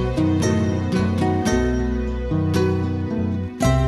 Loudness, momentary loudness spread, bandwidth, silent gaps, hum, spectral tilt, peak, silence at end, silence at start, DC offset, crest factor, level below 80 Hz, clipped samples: -21 LUFS; 4 LU; 13 kHz; none; none; -7 dB/octave; -4 dBFS; 0 s; 0 s; under 0.1%; 14 dB; -30 dBFS; under 0.1%